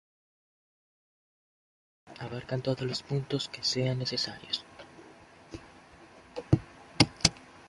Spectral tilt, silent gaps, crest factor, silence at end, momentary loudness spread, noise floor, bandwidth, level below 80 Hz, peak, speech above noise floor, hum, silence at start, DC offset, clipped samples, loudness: -4 dB/octave; none; 30 dB; 0 s; 21 LU; -54 dBFS; 11.5 kHz; -54 dBFS; -4 dBFS; 22 dB; none; 2.05 s; under 0.1%; under 0.1%; -30 LUFS